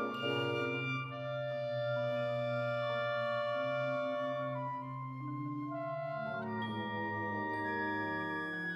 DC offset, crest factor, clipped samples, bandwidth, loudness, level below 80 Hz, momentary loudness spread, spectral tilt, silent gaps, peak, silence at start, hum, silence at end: under 0.1%; 14 dB; under 0.1%; 8.4 kHz; -37 LUFS; -78 dBFS; 5 LU; -7 dB/octave; none; -24 dBFS; 0 s; none; 0 s